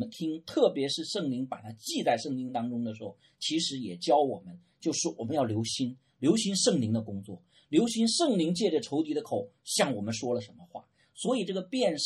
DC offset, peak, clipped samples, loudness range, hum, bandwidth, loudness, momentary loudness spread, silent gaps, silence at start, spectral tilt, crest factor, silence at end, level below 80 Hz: under 0.1%; -12 dBFS; under 0.1%; 3 LU; none; 12.5 kHz; -30 LUFS; 12 LU; none; 0 s; -4.5 dB/octave; 18 dB; 0 s; -74 dBFS